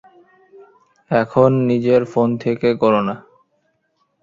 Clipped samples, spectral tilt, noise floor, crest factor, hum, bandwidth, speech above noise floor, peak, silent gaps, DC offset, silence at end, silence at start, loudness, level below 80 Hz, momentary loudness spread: under 0.1%; -8.5 dB/octave; -67 dBFS; 18 dB; none; 7.4 kHz; 51 dB; 0 dBFS; none; under 0.1%; 1.05 s; 1.1 s; -17 LUFS; -56 dBFS; 6 LU